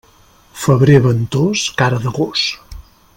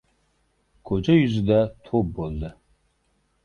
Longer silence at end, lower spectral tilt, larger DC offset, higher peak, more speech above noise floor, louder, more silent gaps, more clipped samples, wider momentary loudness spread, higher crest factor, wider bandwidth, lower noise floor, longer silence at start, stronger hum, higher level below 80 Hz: second, 0.35 s vs 0.95 s; second, -5.5 dB/octave vs -8.5 dB/octave; neither; first, 0 dBFS vs -6 dBFS; second, 35 dB vs 47 dB; first, -14 LUFS vs -23 LUFS; neither; neither; second, 10 LU vs 13 LU; about the same, 16 dB vs 18 dB; first, 16.5 kHz vs 6.8 kHz; second, -48 dBFS vs -68 dBFS; second, 0.55 s vs 0.85 s; neither; about the same, -42 dBFS vs -44 dBFS